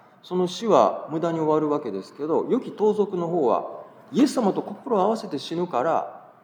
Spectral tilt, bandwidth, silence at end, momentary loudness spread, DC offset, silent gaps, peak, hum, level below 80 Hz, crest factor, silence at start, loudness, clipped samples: -6.5 dB/octave; 19.5 kHz; 0.2 s; 10 LU; under 0.1%; none; -4 dBFS; none; -86 dBFS; 20 dB; 0.25 s; -24 LUFS; under 0.1%